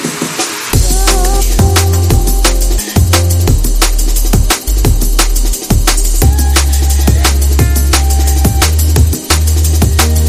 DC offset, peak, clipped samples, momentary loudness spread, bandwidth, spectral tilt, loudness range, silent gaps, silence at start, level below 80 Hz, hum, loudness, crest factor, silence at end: under 0.1%; 0 dBFS; 0.1%; 3 LU; 16 kHz; -4 dB/octave; 1 LU; none; 0 s; -10 dBFS; none; -11 LUFS; 8 dB; 0 s